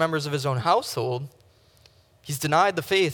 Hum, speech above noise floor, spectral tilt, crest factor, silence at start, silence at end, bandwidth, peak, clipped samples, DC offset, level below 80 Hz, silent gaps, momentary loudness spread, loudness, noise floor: none; 33 dB; -4.5 dB/octave; 18 dB; 0 s; 0 s; 19.5 kHz; -6 dBFS; under 0.1%; under 0.1%; -66 dBFS; none; 13 LU; -24 LUFS; -57 dBFS